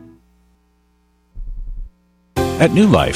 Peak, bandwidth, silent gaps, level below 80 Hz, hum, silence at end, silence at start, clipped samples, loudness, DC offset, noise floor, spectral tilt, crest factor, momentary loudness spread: 0 dBFS; 16 kHz; none; -32 dBFS; 60 Hz at -50 dBFS; 0 s; 1.35 s; under 0.1%; -15 LUFS; under 0.1%; -59 dBFS; -6.5 dB/octave; 18 dB; 25 LU